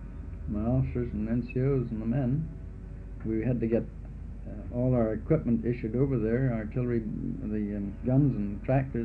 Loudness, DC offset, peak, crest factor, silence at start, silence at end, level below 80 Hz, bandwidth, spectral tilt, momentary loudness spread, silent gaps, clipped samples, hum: -30 LUFS; under 0.1%; -12 dBFS; 18 dB; 0 s; 0 s; -40 dBFS; 4.4 kHz; -12 dB/octave; 15 LU; none; under 0.1%; none